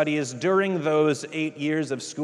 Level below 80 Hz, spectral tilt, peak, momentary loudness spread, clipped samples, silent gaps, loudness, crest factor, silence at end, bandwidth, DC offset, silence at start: -76 dBFS; -5 dB/octave; -8 dBFS; 6 LU; under 0.1%; none; -25 LUFS; 16 dB; 0 s; 11.5 kHz; under 0.1%; 0 s